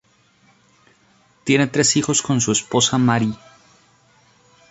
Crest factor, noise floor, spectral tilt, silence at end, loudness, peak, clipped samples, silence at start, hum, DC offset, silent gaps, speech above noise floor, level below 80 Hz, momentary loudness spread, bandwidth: 18 dB; -57 dBFS; -3.5 dB/octave; 1.35 s; -18 LUFS; -2 dBFS; under 0.1%; 1.45 s; none; under 0.1%; none; 39 dB; -56 dBFS; 9 LU; 8.4 kHz